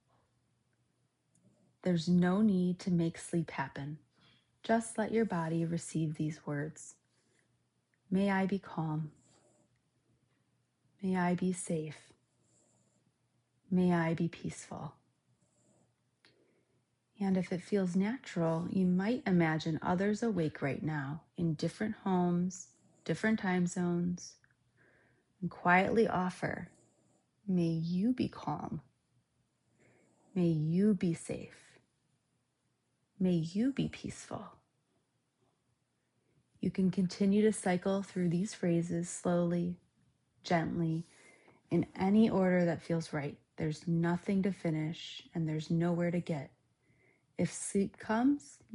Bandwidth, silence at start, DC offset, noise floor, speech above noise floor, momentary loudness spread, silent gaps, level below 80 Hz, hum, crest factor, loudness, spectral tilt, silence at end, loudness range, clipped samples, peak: 11 kHz; 1.85 s; under 0.1%; -80 dBFS; 47 dB; 14 LU; none; -70 dBFS; none; 20 dB; -34 LUFS; -6.5 dB/octave; 0 s; 6 LU; under 0.1%; -14 dBFS